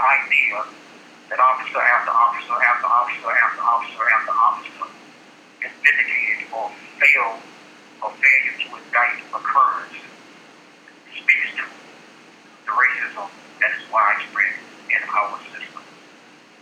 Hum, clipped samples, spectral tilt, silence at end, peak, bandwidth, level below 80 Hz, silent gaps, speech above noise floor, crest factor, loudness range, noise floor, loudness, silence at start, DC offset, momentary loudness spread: none; under 0.1%; -1.5 dB/octave; 0.8 s; 0 dBFS; 13 kHz; under -90 dBFS; none; 28 dB; 20 dB; 5 LU; -48 dBFS; -18 LUFS; 0 s; under 0.1%; 18 LU